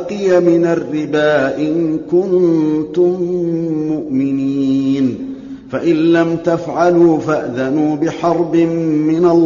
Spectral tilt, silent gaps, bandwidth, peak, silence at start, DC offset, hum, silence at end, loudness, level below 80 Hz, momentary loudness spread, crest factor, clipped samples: -6.5 dB/octave; none; 7.4 kHz; -2 dBFS; 0 s; under 0.1%; none; 0 s; -15 LUFS; -52 dBFS; 6 LU; 12 dB; under 0.1%